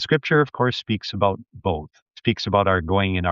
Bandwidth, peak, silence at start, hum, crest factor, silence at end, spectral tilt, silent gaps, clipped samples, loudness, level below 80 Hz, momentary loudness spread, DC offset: 7.4 kHz; -4 dBFS; 0 s; none; 18 dB; 0 s; -4.5 dB/octave; 2.02-2.06 s; under 0.1%; -22 LUFS; -50 dBFS; 8 LU; under 0.1%